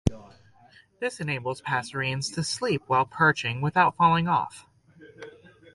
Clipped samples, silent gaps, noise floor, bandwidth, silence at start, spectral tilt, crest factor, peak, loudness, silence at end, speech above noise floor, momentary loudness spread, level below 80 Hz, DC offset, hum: under 0.1%; none; -57 dBFS; 11.5 kHz; 0.05 s; -5 dB/octave; 22 dB; -4 dBFS; -25 LUFS; 0.45 s; 31 dB; 16 LU; -50 dBFS; under 0.1%; none